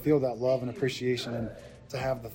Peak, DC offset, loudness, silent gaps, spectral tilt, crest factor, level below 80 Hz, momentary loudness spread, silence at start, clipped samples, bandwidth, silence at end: -12 dBFS; under 0.1%; -31 LUFS; none; -6.5 dB/octave; 18 dB; -56 dBFS; 13 LU; 0 s; under 0.1%; 16 kHz; 0 s